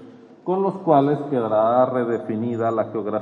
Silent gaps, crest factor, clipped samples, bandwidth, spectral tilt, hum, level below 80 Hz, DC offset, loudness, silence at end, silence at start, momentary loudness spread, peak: none; 18 dB; under 0.1%; 7.2 kHz; -9.5 dB/octave; none; -72 dBFS; under 0.1%; -21 LUFS; 0 s; 0 s; 8 LU; -4 dBFS